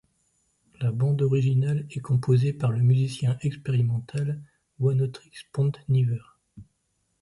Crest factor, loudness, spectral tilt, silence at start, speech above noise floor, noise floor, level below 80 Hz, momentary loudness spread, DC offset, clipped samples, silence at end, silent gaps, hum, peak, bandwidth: 14 dB; -25 LUFS; -8.5 dB/octave; 0.8 s; 50 dB; -74 dBFS; -60 dBFS; 9 LU; under 0.1%; under 0.1%; 0.6 s; none; none; -10 dBFS; 11.5 kHz